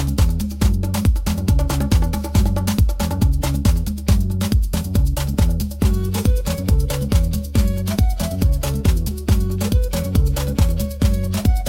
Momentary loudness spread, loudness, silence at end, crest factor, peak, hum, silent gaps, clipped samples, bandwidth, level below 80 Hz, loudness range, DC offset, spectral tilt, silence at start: 2 LU; -20 LUFS; 0 s; 16 dB; -2 dBFS; none; none; under 0.1%; 17 kHz; -20 dBFS; 1 LU; under 0.1%; -6 dB/octave; 0 s